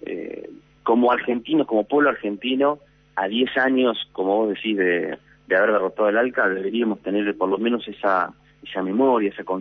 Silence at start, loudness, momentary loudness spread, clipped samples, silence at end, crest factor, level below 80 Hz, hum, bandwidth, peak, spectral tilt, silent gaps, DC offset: 0 s; -21 LUFS; 11 LU; under 0.1%; 0 s; 14 dB; -64 dBFS; none; 5.8 kHz; -8 dBFS; -7.5 dB/octave; none; under 0.1%